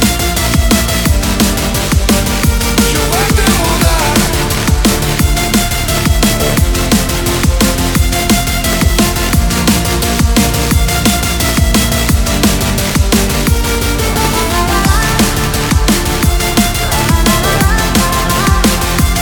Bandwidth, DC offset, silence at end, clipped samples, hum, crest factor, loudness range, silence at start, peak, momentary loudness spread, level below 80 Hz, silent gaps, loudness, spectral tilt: 19.5 kHz; under 0.1%; 0 s; under 0.1%; none; 10 dB; 1 LU; 0 s; 0 dBFS; 2 LU; -16 dBFS; none; -11 LUFS; -4 dB/octave